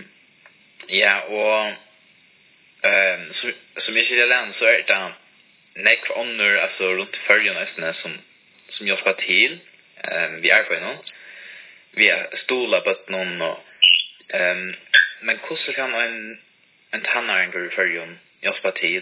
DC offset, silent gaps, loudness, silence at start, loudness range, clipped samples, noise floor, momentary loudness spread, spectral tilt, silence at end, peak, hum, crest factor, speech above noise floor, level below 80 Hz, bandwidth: under 0.1%; none; -19 LUFS; 0 s; 3 LU; under 0.1%; -55 dBFS; 16 LU; -5.5 dB/octave; 0 s; 0 dBFS; none; 22 dB; 34 dB; -76 dBFS; 4 kHz